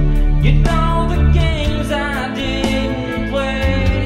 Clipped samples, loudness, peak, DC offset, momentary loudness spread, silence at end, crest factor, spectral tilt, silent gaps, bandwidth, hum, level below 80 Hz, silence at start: under 0.1%; -17 LUFS; 0 dBFS; under 0.1%; 6 LU; 0 s; 14 dB; -6.5 dB/octave; none; 12 kHz; none; -18 dBFS; 0 s